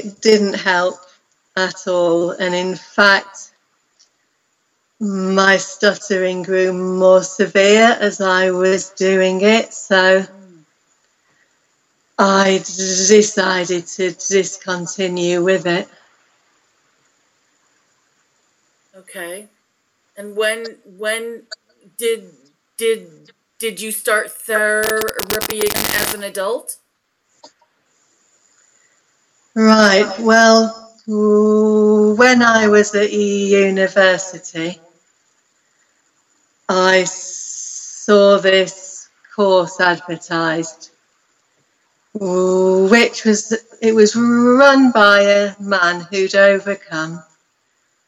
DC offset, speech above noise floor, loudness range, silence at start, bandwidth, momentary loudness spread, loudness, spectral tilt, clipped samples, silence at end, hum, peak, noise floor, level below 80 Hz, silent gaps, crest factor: under 0.1%; 52 dB; 12 LU; 0 s; 16 kHz; 16 LU; -14 LUFS; -3.5 dB/octave; under 0.1%; 0.85 s; none; 0 dBFS; -67 dBFS; -60 dBFS; none; 16 dB